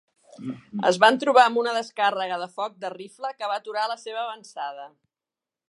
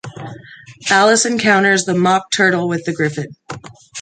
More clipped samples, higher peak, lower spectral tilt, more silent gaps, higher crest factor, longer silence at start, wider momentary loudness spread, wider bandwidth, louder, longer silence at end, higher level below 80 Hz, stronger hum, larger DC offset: neither; about the same, -2 dBFS vs -2 dBFS; about the same, -3.5 dB/octave vs -3.5 dB/octave; neither; first, 22 dB vs 16 dB; first, 0.35 s vs 0.05 s; second, 18 LU vs 21 LU; first, 11.5 kHz vs 9.6 kHz; second, -24 LUFS vs -14 LUFS; first, 0.85 s vs 0 s; second, -78 dBFS vs -60 dBFS; neither; neither